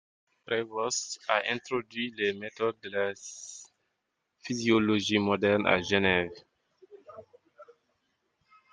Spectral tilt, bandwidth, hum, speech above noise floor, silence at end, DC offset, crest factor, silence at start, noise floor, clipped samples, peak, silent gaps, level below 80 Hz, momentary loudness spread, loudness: -4 dB/octave; 10 kHz; none; 52 dB; 1.1 s; under 0.1%; 26 dB; 0.5 s; -81 dBFS; under 0.1%; -6 dBFS; none; -66 dBFS; 17 LU; -29 LUFS